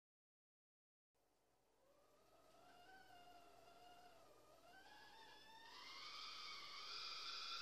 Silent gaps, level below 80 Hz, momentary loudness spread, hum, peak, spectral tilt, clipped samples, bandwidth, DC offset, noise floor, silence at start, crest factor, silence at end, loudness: none; -88 dBFS; 18 LU; none; -40 dBFS; 0 dB/octave; under 0.1%; 15 kHz; under 0.1%; -83 dBFS; 1.15 s; 20 dB; 0 s; -54 LUFS